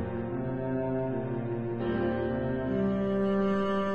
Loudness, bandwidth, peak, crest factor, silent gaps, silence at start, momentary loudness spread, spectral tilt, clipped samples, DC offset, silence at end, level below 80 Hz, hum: -30 LUFS; 6.8 kHz; -18 dBFS; 12 dB; none; 0 s; 6 LU; -9.5 dB/octave; under 0.1%; 0.3%; 0 s; -50 dBFS; none